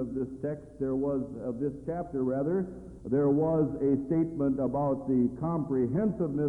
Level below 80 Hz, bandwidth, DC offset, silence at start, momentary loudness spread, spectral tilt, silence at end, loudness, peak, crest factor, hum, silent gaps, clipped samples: -54 dBFS; 2.5 kHz; under 0.1%; 0 s; 9 LU; -11.5 dB/octave; 0 s; -30 LUFS; -16 dBFS; 14 dB; none; none; under 0.1%